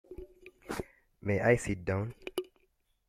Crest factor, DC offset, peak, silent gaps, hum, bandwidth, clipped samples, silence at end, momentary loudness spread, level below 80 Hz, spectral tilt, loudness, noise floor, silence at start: 24 dB; under 0.1%; -12 dBFS; none; none; 16 kHz; under 0.1%; 0.6 s; 24 LU; -56 dBFS; -6 dB/octave; -33 LUFS; -74 dBFS; 0.1 s